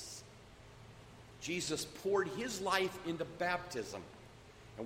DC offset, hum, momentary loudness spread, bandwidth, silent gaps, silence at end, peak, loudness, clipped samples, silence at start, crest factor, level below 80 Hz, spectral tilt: under 0.1%; none; 22 LU; 16 kHz; none; 0 s; -18 dBFS; -38 LUFS; under 0.1%; 0 s; 22 dB; -66 dBFS; -3.5 dB/octave